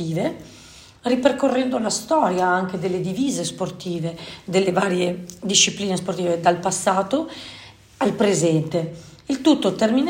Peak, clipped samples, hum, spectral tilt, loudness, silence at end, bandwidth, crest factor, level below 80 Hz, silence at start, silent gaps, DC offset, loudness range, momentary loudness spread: -2 dBFS; under 0.1%; none; -4 dB/octave; -21 LUFS; 0 s; 16.5 kHz; 20 dB; -58 dBFS; 0 s; none; under 0.1%; 2 LU; 12 LU